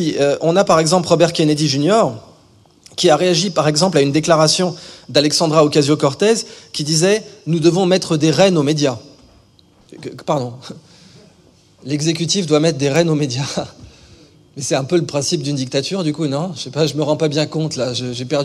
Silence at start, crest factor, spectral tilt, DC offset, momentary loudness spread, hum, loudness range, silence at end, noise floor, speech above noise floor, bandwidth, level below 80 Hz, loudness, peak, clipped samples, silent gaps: 0 s; 16 dB; -4.5 dB/octave; under 0.1%; 11 LU; none; 6 LU; 0 s; -51 dBFS; 35 dB; 13 kHz; -56 dBFS; -16 LUFS; 0 dBFS; under 0.1%; none